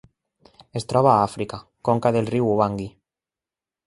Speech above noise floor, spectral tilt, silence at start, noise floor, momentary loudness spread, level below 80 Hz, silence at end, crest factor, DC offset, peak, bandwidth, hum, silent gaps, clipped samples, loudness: 69 dB; -7 dB/octave; 0.75 s; -90 dBFS; 15 LU; -54 dBFS; 0.95 s; 20 dB; under 0.1%; -2 dBFS; 11.5 kHz; none; none; under 0.1%; -22 LUFS